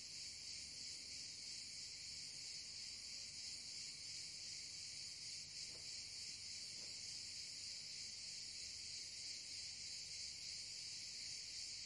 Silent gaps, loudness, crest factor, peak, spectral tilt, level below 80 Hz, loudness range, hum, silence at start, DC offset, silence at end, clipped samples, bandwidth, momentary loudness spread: none; -49 LUFS; 14 dB; -36 dBFS; 1 dB/octave; -78 dBFS; 1 LU; none; 0 s; under 0.1%; 0 s; under 0.1%; 12 kHz; 1 LU